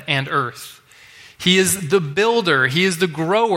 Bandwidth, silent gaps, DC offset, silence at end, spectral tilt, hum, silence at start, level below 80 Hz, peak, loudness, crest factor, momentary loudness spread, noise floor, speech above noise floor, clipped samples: 16.5 kHz; none; under 0.1%; 0 s; -3.5 dB/octave; none; 0 s; -58 dBFS; -2 dBFS; -17 LUFS; 18 dB; 9 LU; -45 dBFS; 27 dB; under 0.1%